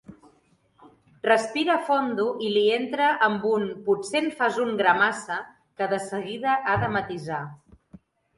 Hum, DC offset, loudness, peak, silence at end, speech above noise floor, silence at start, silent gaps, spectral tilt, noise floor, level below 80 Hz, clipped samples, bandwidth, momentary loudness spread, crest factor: none; under 0.1%; -24 LUFS; -4 dBFS; 0.85 s; 39 dB; 0.1 s; none; -4.5 dB/octave; -63 dBFS; -60 dBFS; under 0.1%; 11.5 kHz; 10 LU; 20 dB